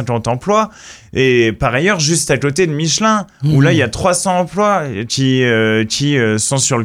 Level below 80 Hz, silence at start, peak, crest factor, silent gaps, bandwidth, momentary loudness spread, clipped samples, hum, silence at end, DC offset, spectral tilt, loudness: -40 dBFS; 0 s; 0 dBFS; 14 dB; none; 15 kHz; 4 LU; under 0.1%; none; 0 s; under 0.1%; -4.5 dB/octave; -14 LUFS